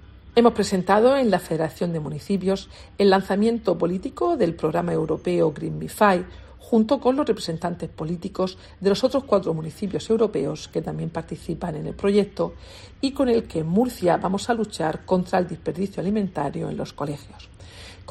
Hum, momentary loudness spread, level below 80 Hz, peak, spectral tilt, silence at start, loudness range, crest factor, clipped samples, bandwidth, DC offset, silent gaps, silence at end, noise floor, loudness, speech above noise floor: none; 11 LU; -50 dBFS; -2 dBFS; -6.5 dB/octave; 0 s; 4 LU; 20 dB; under 0.1%; 14 kHz; under 0.1%; none; 0.1 s; -42 dBFS; -23 LUFS; 20 dB